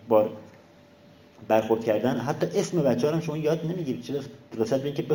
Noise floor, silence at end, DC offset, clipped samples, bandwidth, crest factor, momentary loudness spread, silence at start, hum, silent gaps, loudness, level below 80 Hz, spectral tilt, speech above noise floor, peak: -53 dBFS; 0 s; under 0.1%; under 0.1%; 17 kHz; 18 dB; 9 LU; 0 s; none; none; -26 LUFS; -64 dBFS; -6.5 dB/octave; 28 dB; -8 dBFS